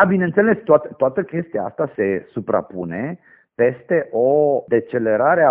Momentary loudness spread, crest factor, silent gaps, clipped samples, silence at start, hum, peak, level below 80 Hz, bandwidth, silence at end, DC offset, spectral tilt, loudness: 11 LU; 18 dB; none; under 0.1%; 0 s; none; 0 dBFS; -60 dBFS; 3.5 kHz; 0 s; under 0.1%; -8 dB/octave; -19 LUFS